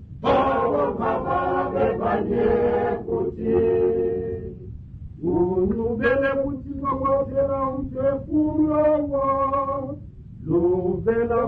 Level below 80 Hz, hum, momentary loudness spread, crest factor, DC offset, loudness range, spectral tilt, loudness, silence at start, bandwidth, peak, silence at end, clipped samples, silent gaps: -42 dBFS; none; 10 LU; 14 dB; under 0.1%; 2 LU; -10 dB/octave; -22 LUFS; 0 s; 5 kHz; -8 dBFS; 0 s; under 0.1%; none